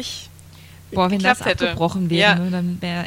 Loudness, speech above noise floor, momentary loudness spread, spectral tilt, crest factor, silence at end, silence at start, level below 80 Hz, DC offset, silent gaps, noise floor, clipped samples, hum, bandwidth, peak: -19 LUFS; 23 dB; 12 LU; -5 dB/octave; 20 dB; 0 s; 0 s; -48 dBFS; under 0.1%; none; -43 dBFS; under 0.1%; none; 16 kHz; 0 dBFS